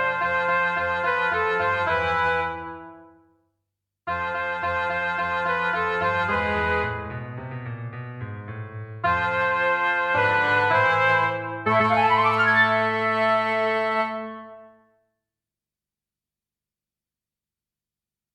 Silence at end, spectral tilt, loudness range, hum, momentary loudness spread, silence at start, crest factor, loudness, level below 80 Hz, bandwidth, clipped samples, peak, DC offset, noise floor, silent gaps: 3.65 s; -6 dB/octave; 8 LU; 50 Hz at -70 dBFS; 16 LU; 0 s; 16 dB; -22 LUFS; -52 dBFS; 11.5 kHz; under 0.1%; -8 dBFS; under 0.1%; under -90 dBFS; none